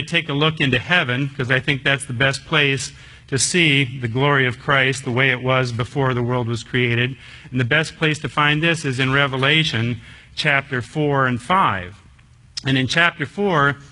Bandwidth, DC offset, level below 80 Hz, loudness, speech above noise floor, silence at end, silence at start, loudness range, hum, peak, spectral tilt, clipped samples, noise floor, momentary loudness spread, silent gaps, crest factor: 11 kHz; under 0.1%; -50 dBFS; -18 LUFS; 29 dB; 0.05 s; 0 s; 2 LU; none; 0 dBFS; -4.5 dB/octave; under 0.1%; -48 dBFS; 8 LU; none; 20 dB